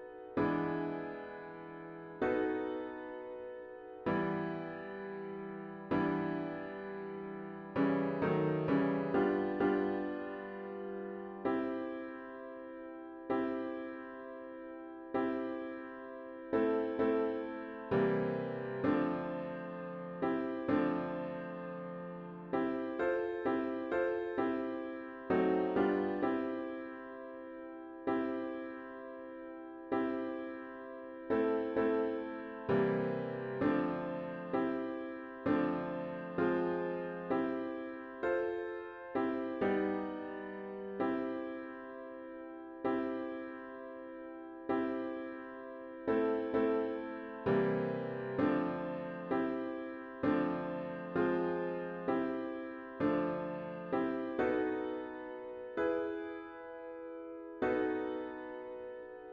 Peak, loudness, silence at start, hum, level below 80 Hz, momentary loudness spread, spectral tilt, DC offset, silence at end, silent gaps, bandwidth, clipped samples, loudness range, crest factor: -20 dBFS; -37 LUFS; 0 s; none; -70 dBFS; 14 LU; -9.5 dB/octave; under 0.1%; 0 s; none; 5.6 kHz; under 0.1%; 6 LU; 18 dB